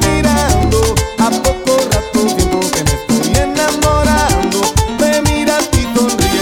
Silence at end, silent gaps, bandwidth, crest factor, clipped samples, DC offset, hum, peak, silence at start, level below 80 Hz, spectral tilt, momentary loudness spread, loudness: 0 s; none; 20 kHz; 12 dB; under 0.1%; under 0.1%; none; 0 dBFS; 0 s; -20 dBFS; -4.5 dB/octave; 3 LU; -13 LUFS